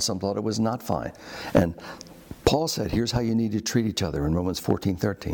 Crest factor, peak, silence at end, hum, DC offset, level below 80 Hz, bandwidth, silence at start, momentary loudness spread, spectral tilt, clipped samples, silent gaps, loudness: 18 dB; -8 dBFS; 0 s; none; under 0.1%; -44 dBFS; 19.5 kHz; 0 s; 13 LU; -5 dB/octave; under 0.1%; none; -26 LUFS